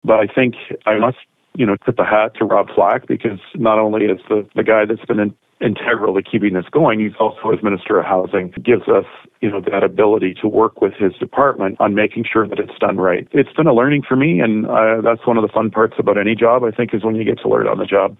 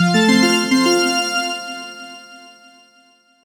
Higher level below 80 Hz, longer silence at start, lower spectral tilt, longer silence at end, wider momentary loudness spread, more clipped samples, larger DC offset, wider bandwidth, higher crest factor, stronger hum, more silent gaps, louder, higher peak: first, -54 dBFS vs -66 dBFS; about the same, 0.05 s vs 0 s; first, -10 dB/octave vs -4 dB/octave; second, 0.05 s vs 1 s; second, 6 LU vs 21 LU; neither; neither; second, 4 kHz vs over 20 kHz; about the same, 14 dB vs 16 dB; neither; neither; about the same, -16 LUFS vs -15 LUFS; about the same, -2 dBFS vs -2 dBFS